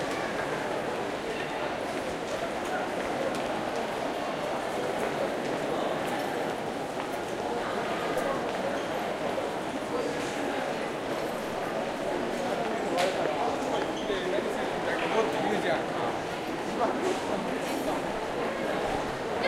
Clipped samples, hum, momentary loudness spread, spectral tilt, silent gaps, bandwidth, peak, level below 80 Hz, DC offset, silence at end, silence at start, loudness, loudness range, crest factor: under 0.1%; none; 4 LU; -4.5 dB/octave; none; 16 kHz; -12 dBFS; -56 dBFS; under 0.1%; 0 s; 0 s; -31 LUFS; 3 LU; 18 dB